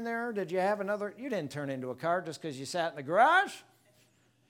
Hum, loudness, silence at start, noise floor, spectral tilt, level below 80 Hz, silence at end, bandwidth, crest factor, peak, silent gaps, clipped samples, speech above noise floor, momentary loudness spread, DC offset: none; -31 LUFS; 0 s; -68 dBFS; -4.5 dB/octave; -84 dBFS; 0.9 s; 17.5 kHz; 22 dB; -10 dBFS; none; under 0.1%; 36 dB; 13 LU; under 0.1%